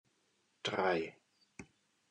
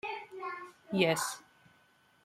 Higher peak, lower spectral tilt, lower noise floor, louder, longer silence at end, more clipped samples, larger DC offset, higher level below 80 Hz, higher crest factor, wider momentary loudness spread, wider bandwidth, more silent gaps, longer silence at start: second, -20 dBFS vs -14 dBFS; about the same, -4.5 dB/octave vs -4 dB/octave; first, -77 dBFS vs -67 dBFS; second, -37 LUFS vs -34 LUFS; second, 0.45 s vs 0.85 s; neither; neither; about the same, -78 dBFS vs -76 dBFS; about the same, 20 dB vs 24 dB; first, 22 LU vs 15 LU; second, 10.5 kHz vs 16 kHz; neither; first, 0.65 s vs 0.05 s